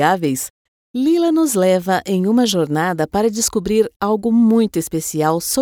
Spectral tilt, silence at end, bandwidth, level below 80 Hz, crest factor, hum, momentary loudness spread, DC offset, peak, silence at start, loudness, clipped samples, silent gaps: -4.5 dB/octave; 0 s; 18.5 kHz; -48 dBFS; 16 dB; none; 7 LU; under 0.1%; -2 dBFS; 0 s; -17 LUFS; under 0.1%; 0.50-0.94 s, 3.96-4.00 s